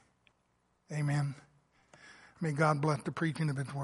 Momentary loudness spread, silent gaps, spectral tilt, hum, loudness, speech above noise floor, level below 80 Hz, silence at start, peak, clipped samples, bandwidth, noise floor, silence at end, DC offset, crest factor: 12 LU; none; -7 dB/octave; none; -33 LUFS; 43 dB; -72 dBFS; 0.9 s; -14 dBFS; under 0.1%; 11.5 kHz; -75 dBFS; 0 s; under 0.1%; 20 dB